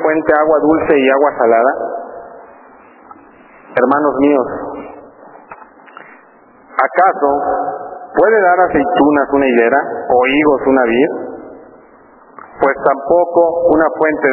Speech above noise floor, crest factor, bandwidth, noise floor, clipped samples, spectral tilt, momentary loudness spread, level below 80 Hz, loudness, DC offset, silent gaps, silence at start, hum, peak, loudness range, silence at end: 33 dB; 14 dB; 4 kHz; -44 dBFS; under 0.1%; -9 dB/octave; 13 LU; -48 dBFS; -13 LUFS; under 0.1%; none; 0 s; none; 0 dBFS; 6 LU; 0 s